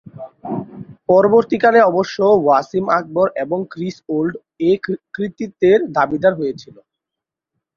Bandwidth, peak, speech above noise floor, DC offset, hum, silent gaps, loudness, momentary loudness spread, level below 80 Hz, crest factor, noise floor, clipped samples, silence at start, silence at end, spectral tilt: 7.2 kHz; 0 dBFS; 69 dB; under 0.1%; none; none; -17 LUFS; 15 LU; -58 dBFS; 16 dB; -85 dBFS; under 0.1%; 0.15 s; 1.15 s; -7 dB/octave